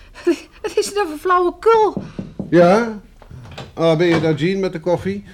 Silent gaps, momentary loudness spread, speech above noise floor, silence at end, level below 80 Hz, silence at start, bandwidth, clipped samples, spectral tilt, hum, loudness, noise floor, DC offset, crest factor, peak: none; 17 LU; 22 dB; 0 s; -46 dBFS; 0.15 s; 15 kHz; under 0.1%; -6 dB/octave; none; -17 LUFS; -38 dBFS; under 0.1%; 16 dB; -2 dBFS